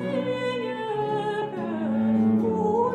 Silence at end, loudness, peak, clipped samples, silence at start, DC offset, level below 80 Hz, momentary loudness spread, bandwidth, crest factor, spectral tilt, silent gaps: 0 s; -25 LUFS; -12 dBFS; under 0.1%; 0 s; under 0.1%; -64 dBFS; 7 LU; 9 kHz; 12 dB; -8 dB/octave; none